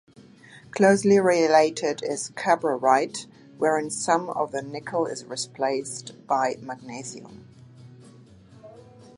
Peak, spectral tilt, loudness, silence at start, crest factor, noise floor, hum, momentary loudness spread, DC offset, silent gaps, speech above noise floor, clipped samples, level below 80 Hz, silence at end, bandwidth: -4 dBFS; -4.5 dB/octave; -23 LUFS; 0.55 s; 22 dB; -50 dBFS; none; 17 LU; under 0.1%; none; 26 dB; under 0.1%; -68 dBFS; 0.35 s; 11.5 kHz